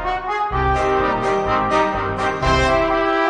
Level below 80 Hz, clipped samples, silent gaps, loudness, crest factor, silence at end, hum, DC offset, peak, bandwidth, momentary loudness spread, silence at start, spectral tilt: -30 dBFS; under 0.1%; none; -18 LUFS; 14 dB; 0 s; none; under 0.1%; -4 dBFS; 10 kHz; 5 LU; 0 s; -5.5 dB/octave